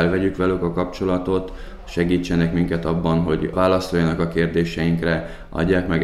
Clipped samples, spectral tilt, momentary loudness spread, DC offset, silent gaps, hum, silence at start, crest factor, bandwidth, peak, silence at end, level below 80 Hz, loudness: under 0.1%; -7.5 dB/octave; 6 LU; under 0.1%; none; none; 0 s; 16 dB; 12 kHz; -4 dBFS; 0 s; -36 dBFS; -21 LUFS